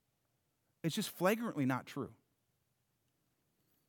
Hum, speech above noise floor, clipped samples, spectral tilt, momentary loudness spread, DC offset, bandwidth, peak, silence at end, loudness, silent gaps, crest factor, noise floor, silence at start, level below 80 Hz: none; 45 dB; under 0.1%; -5 dB/octave; 11 LU; under 0.1%; over 20 kHz; -18 dBFS; 1.75 s; -37 LUFS; none; 22 dB; -82 dBFS; 0.85 s; -86 dBFS